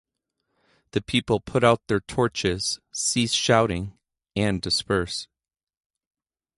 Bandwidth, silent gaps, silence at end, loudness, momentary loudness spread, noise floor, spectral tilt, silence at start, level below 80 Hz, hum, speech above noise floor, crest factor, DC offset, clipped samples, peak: 11.5 kHz; none; 1.35 s; -24 LUFS; 11 LU; under -90 dBFS; -4 dB/octave; 0.95 s; -48 dBFS; none; over 66 dB; 22 dB; under 0.1%; under 0.1%; -4 dBFS